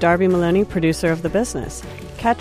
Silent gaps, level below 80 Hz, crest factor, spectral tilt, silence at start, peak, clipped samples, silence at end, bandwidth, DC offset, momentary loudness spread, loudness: none; -38 dBFS; 14 dB; -6 dB/octave; 0 s; -4 dBFS; under 0.1%; 0 s; 15 kHz; under 0.1%; 14 LU; -19 LUFS